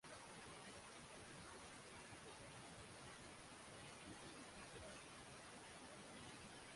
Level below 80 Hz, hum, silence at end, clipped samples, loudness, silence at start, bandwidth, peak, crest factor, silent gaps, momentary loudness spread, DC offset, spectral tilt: -74 dBFS; none; 0 s; under 0.1%; -58 LUFS; 0.05 s; 11.5 kHz; -44 dBFS; 14 dB; none; 1 LU; under 0.1%; -3 dB/octave